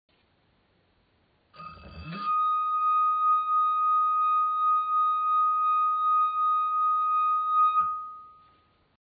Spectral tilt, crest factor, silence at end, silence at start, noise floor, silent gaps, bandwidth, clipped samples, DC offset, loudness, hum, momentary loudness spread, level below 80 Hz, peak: -6.5 dB/octave; 10 dB; 0.75 s; 1.6 s; -68 dBFS; none; 5 kHz; under 0.1%; under 0.1%; -24 LUFS; none; 12 LU; -66 dBFS; -16 dBFS